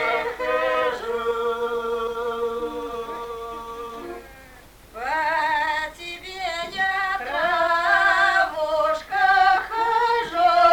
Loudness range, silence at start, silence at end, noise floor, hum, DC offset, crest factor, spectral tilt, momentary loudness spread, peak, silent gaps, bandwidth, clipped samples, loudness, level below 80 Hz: 10 LU; 0 s; 0 s; -47 dBFS; none; under 0.1%; 18 dB; -2.5 dB/octave; 16 LU; -4 dBFS; none; 20 kHz; under 0.1%; -22 LUFS; -52 dBFS